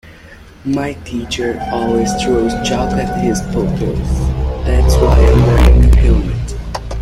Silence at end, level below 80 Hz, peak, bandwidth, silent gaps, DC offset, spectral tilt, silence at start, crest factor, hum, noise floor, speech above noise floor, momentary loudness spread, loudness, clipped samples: 0 s; -14 dBFS; 0 dBFS; 12 kHz; none; under 0.1%; -6.5 dB/octave; 0.05 s; 12 dB; none; -37 dBFS; 26 dB; 12 LU; -14 LUFS; under 0.1%